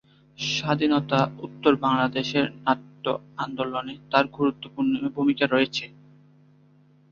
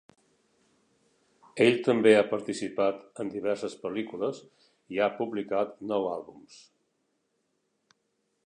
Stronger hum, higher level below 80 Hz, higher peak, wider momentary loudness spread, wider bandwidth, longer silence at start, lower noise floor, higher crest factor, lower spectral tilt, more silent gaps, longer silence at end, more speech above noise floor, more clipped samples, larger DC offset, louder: neither; first, -62 dBFS vs -76 dBFS; first, -4 dBFS vs -8 dBFS; second, 8 LU vs 15 LU; second, 7.2 kHz vs 10.5 kHz; second, 0.4 s vs 1.55 s; second, -57 dBFS vs -77 dBFS; about the same, 22 dB vs 22 dB; about the same, -5.5 dB/octave vs -5.5 dB/octave; neither; second, 1.2 s vs 1.9 s; second, 33 dB vs 49 dB; neither; neither; first, -25 LUFS vs -28 LUFS